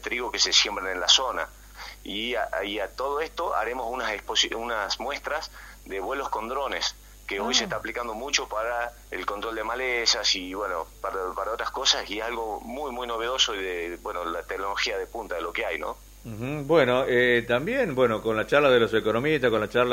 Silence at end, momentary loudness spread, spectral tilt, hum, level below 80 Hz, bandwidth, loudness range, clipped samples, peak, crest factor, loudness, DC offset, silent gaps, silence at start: 0 s; 12 LU; -2.5 dB/octave; none; -50 dBFS; 16 kHz; 6 LU; under 0.1%; -4 dBFS; 24 dB; -26 LUFS; under 0.1%; none; 0 s